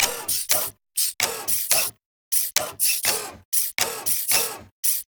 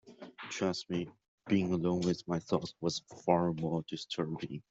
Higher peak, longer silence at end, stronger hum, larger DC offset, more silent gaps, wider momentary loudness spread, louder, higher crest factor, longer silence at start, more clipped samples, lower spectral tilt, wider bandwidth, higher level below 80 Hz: first, -2 dBFS vs -12 dBFS; about the same, 0.05 s vs 0.1 s; neither; neither; first, 2.06-2.31 s, 3.45-3.52 s, 4.71-4.83 s vs 1.28-1.38 s; second, 5 LU vs 12 LU; first, -21 LUFS vs -34 LUFS; about the same, 24 dB vs 22 dB; about the same, 0 s vs 0.05 s; neither; second, 1 dB/octave vs -6 dB/octave; first, over 20 kHz vs 8 kHz; first, -60 dBFS vs -68 dBFS